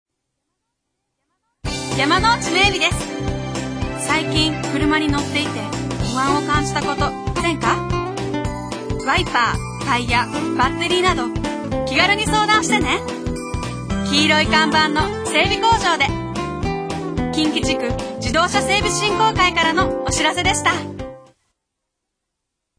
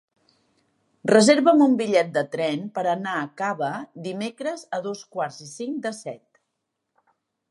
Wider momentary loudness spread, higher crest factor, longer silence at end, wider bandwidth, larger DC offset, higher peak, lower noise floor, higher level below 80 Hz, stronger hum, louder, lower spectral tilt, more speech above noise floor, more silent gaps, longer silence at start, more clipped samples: second, 10 LU vs 17 LU; about the same, 18 dB vs 22 dB; first, 1.6 s vs 1.35 s; about the same, 10.5 kHz vs 11.5 kHz; neither; about the same, -2 dBFS vs -2 dBFS; about the same, -78 dBFS vs -79 dBFS; first, -34 dBFS vs -78 dBFS; neither; first, -18 LUFS vs -23 LUFS; about the same, -4 dB/octave vs -4.5 dB/octave; first, 61 dB vs 57 dB; neither; first, 1.65 s vs 1.05 s; neither